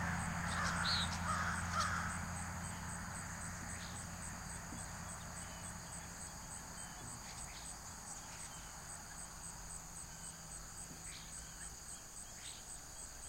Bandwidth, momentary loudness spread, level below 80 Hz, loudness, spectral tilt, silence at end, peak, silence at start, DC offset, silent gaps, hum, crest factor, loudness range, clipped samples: 16 kHz; 11 LU; -56 dBFS; -44 LUFS; -2.5 dB/octave; 0 s; -24 dBFS; 0 s; under 0.1%; none; none; 22 dB; 9 LU; under 0.1%